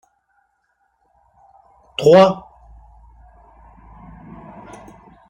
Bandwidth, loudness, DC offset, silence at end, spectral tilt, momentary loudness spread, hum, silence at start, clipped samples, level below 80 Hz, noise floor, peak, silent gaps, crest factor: 10.5 kHz; -14 LUFS; under 0.1%; 2.9 s; -6.5 dB/octave; 29 LU; none; 2 s; under 0.1%; -50 dBFS; -67 dBFS; -2 dBFS; none; 20 dB